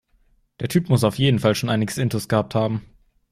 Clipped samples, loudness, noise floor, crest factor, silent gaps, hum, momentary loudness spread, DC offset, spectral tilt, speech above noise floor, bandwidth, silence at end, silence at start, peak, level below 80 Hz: under 0.1%; -21 LUFS; -61 dBFS; 16 dB; none; none; 7 LU; under 0.1%; -6 dB/octave; 41 dB; 15.5 kHz; 0.5 s; 0.6 s; -6 dBFS; -52 dBFS